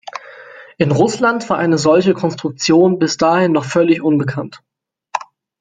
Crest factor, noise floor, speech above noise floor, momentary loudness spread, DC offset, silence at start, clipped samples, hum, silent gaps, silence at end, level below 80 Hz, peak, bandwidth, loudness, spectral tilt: 14 dB; -38 dBFS; 24 dB; 14 LU; under 0.1%; 0.05 s; under 0.1%; none; none; 0.35 s; -56 dBFS; -2 dBFS; 9.4 kHz; -14 LUFS; -5.5 dB/octave